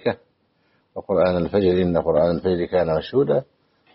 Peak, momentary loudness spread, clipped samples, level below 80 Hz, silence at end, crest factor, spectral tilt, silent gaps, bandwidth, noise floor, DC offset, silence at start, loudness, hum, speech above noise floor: -6 dBFS; 9 LU; under 0.1%; -48 dBFS; 0.5 s; 14 dB; -6.5 dB/octave; none; 5.8 kHz; -65 dBFS; under 0.1%; 0.05 s; -20 LUFS; none; 45 dB